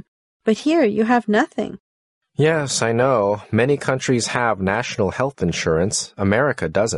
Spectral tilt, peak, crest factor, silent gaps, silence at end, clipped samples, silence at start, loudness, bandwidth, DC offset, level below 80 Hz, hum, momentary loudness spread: -5 dB/octave; -4 dBFS; 16 dB; 1.80-2.21 s; 0 s; under 0.1%; 0.45 s; -19 LUFS; 11.5 kHz; under 0.1%; -52 dBFS; none; 5 LU